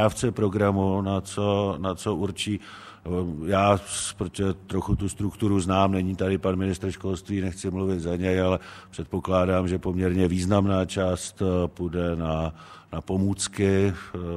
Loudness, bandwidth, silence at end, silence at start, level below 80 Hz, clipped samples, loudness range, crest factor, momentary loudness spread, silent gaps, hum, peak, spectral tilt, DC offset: -26 LUFS; 13.5 kHz; 0 s; 0 s; -46 dBFS; under 0.1%; 2 LU; 20 dB; 8 LU; none; none; -6 dBFS; -6 dB/octave; under 0.1%